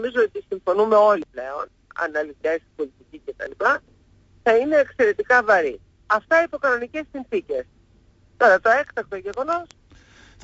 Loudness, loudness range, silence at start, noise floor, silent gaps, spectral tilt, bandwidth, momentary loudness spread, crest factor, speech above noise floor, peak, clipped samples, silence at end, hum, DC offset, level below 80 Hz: -21 LUFS; 4 LU; 0 s; -56 dBFS; none; -4.5 dB/octave; 8 kHz; 16 LU; 16 dB; 35 dB; -6 dBFS; under 0.1%; 0.8 s; none; under 0.1%; -58 dBFS